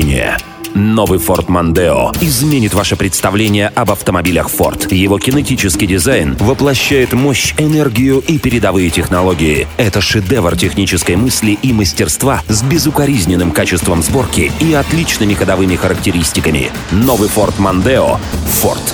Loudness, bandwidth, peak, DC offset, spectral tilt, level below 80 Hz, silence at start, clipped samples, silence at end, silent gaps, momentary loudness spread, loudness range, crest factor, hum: -11 LUFS; over 20 kHz; 0 dBFS; under 0.1%; -4.5 dB/octave; -26 dBFS; 0 s; under 0.1%; 0 s; none; 2 LU; 1 LU; 12 dB; none